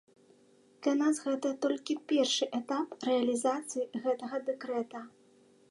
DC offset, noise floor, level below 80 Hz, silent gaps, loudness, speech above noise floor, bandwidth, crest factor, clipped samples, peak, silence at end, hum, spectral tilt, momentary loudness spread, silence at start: under 0.1%; -63 dBFS; -86 dBFS; none; -32 LUFS; 32 dB; 11.5 kHz; 16 dB; under 0.1%; -16 dBFS; 0.6 s; none; -3 dB/octave; 8 LU; 0.8 s